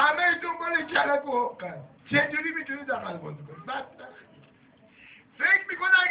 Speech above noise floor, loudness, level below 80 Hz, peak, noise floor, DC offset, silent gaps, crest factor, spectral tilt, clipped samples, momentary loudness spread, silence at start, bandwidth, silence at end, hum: 30 dB; -26 LUFS; -68 dBFS; -8 dBFS; -58 dBFS; under 0.1%; none; 20 dB; -1 dB/octave; under 0.1%; 18 LU; 0 s; 4 kHz; 0 s; none